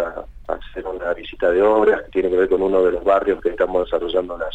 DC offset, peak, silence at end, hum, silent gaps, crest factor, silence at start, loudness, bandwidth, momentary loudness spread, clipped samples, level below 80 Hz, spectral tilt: under 0.1%; -4 dBFS; 0 s; none; none; 14 dB; 0 s; -19 LUFS; 8 kHz; 13 LU; under 0.1%; -40 dBFS; -7 dB/octave